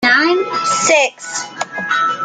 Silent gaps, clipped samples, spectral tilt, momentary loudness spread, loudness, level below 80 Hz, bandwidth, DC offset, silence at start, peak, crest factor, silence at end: none; under 0.1%; -1.5 dB/octave; 12 LU; -15 LUFS; -64 dBFS; 9.8 kHz; under 0.1%; 0 s; 0 dBFS; 14 dB; 0 s